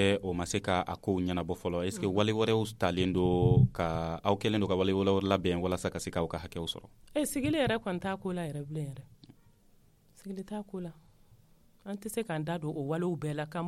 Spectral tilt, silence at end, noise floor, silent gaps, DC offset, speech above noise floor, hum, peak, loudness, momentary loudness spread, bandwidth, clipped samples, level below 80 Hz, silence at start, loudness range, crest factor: -6 dB/octave; 0 s; -63 dBFS; none; under 0.1%; 32 dB; none; -12 dBFS; -31 LUFS; 13 LU; 15 kHz; under 0.1%; -54 dBFS; 0 s; 13 LU; 20 dB